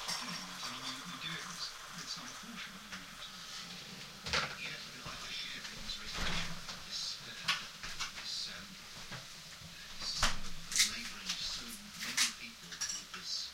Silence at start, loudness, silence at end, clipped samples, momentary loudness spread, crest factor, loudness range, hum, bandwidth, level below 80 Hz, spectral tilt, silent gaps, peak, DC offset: 0 s; -39 LUFS; 0 s; under 0.1%; 13 LU; 26 dB; 7 LU; none; 16 kHz; -52 dBFS; -0.5 dB/octave; none; -14 dBFS; under 0.1%